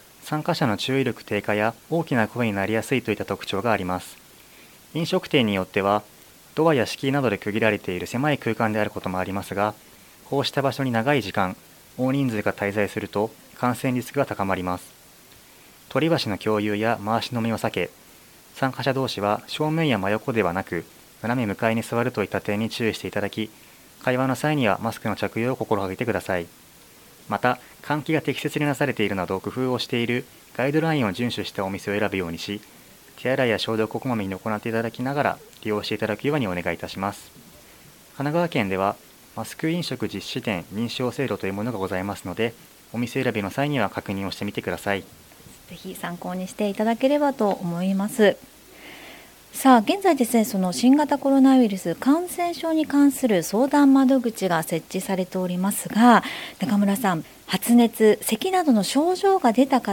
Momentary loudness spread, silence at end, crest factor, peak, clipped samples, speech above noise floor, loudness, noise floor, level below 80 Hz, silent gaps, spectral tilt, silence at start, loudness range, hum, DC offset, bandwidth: 11 LU; 0 s; 22 dB; -2 dBFS; under 0.1%; 27 dB; -23 LUFS; -50 dBFS; -60 dBFS; none; -5.5 dB/octave; 0.2 s; 7 LU; none; under 0.1%; 17.5 kHz